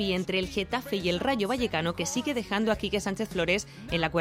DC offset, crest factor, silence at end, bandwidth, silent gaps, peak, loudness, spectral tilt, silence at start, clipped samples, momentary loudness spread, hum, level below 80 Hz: under 0.1%; 18 dB; 0 s; 16 kHz; none; -10 dBFS; -29 LUFS; -4.5 dB/octave; 0 s; under 0.1%; 3 LU; none; -50 dBFS